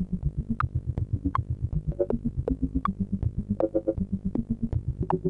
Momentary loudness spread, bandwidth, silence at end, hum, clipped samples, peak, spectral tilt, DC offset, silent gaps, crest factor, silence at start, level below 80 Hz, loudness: 3 LU; 4.8 kHz; 0 s; none; under 0.1%; -12 dBFS; -11 dB/octave; under 0.1%; none; 16 dB; 0 s; -36 dBFS; -30 LUFS